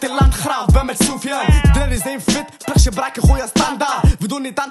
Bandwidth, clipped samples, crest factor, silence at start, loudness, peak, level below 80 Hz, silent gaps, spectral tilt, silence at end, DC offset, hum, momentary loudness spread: 13 kHz; under 0.1%; 14 dB; 0 s; -16 LUFS; 0 dBFS; -18 dBFS; none; -5 dB/octave; 0 s; under 0.1%; none; 6 LU